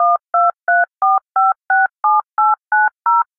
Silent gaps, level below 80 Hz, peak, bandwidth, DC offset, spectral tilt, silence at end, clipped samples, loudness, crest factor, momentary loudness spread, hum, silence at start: none; -78 dBFS; -4 dBFS; 2.3 kHz; under 0.1%; -5.5 dB/octave; 0.15 s; under 0.1%; -15 LUFS; 10 dB; 2 LU; none; 0 s